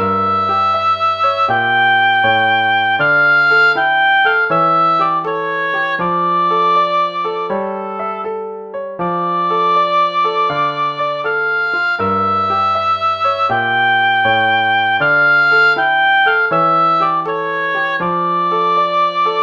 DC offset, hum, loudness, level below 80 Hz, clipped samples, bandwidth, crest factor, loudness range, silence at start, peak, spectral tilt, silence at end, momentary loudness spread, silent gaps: under 0.1%; none; -14 LUFS; -58 dBFS; under 0.1%; 7.4 kHz; 12 dB; 5 LU; 0 s; -2 dBFS; -5.5 dB/octave; 0 s; 8 LU; none